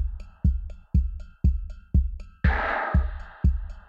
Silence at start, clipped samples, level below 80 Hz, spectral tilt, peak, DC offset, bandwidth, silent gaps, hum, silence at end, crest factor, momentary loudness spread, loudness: 0 s; under 0.1%; -26 dBFS; -9 dB/octave; -10 dBFS; under 0.1%; 4.8 kHz; none; none; 0.1 s; 16 dB; 10 LU; -27 LUFS